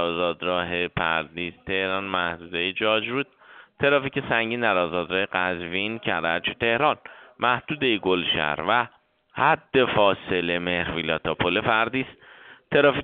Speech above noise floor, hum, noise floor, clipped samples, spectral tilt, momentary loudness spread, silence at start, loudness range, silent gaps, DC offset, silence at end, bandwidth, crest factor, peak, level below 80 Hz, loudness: 25 dB; none; -49 dBFS; under 0.1%; -2 dB/octave; 6 LU; 0 s; 2 LU; none; under 0.1%; 0 s; 4.7 kHz; 20 dB; -4 dBFS; -54 dBFS; -24 LUFS